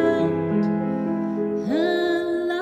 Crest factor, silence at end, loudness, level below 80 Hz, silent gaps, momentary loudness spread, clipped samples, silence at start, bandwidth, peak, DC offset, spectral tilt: 14 dB; 0 s; -23 LUFS; -62 dBFS; none; 4 LU; under 0.1%; 0 s; 9.2 kHz; -8 dBFS; under 0.1%; -7.5 dB/octave